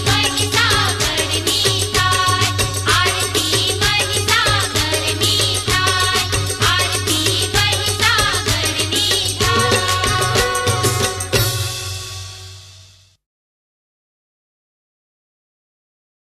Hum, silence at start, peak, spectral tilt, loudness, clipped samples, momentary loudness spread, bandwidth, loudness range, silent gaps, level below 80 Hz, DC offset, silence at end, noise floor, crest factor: none; 0 s; -2 dBFS; -2.5 dB/octave; -15 LUFS; under 0.1%; 4 LU; 14 kHz; 7 LU; none; -36 dBFS; under 0.1%; 3.55 s; -46 dBFS; 16 dB